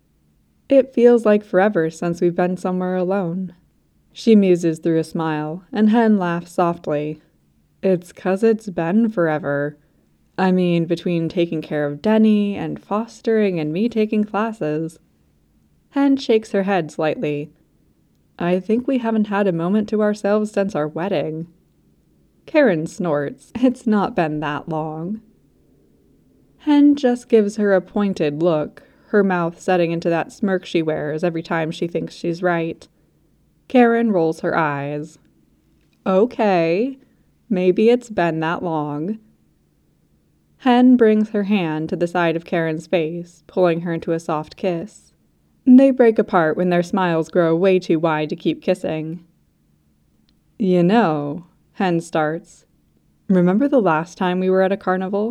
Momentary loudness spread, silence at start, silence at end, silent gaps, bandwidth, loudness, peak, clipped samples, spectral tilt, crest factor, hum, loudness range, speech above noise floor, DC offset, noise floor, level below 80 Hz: 11 LU; 0.7 s; 0 s; none; 11.5 kHz; -19 LUFS; -2 dBFS; under 0.1%; -7.5 dB/octave; 18 dB; none; 4 LU; 42 dB; under 0.1%; -60 dBFS; -60 dBFS